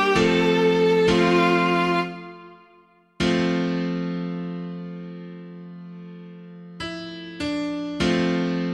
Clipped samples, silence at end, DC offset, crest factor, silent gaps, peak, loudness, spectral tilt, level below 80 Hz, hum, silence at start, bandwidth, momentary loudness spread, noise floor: under 0.1%; 0 s; under 0.1%; 16 dB; none; -6 dBFS; -22 LUFS; -6 dB/octave; -50 dBFS; none; 0 s; 11 kHz; 21 LU; -56 dBFS